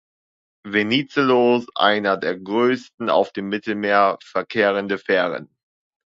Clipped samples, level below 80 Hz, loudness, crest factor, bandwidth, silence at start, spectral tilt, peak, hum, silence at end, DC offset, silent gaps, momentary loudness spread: under 0.1%; -66 dBFS; -20 LUFS; 20 dB; 7.6 kHz; 0.65 s; -6 dB/octave; 0 dBFS; none; 0.65 s; under 0.1%; 2.94-2.98 s; 8 LU